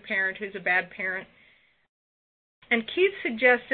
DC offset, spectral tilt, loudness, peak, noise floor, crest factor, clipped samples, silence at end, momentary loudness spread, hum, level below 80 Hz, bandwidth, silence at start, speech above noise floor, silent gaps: under 0.1%; -8 dB/octave; -26 LUFS; -6 dBFS; under -90 dBFS; 22 dB; under 0.1%; 0 s; 9 LU; none; -70 dBFS; 4.6 kHz; 0.05 s; over 64 dB; 1.89-2.62 s